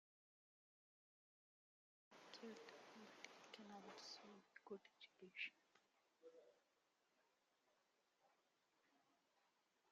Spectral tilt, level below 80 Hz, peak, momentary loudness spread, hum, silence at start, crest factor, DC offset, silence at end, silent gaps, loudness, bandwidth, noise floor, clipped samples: -1 dB/octave; under -90 dBFS; -38 dBFS; 15 LU; none; 2.1 s; 28 dB; under 0.1%; 0 s; none; -60 LUFS; 7.4 kHz; -86 dBFS; under 0.1%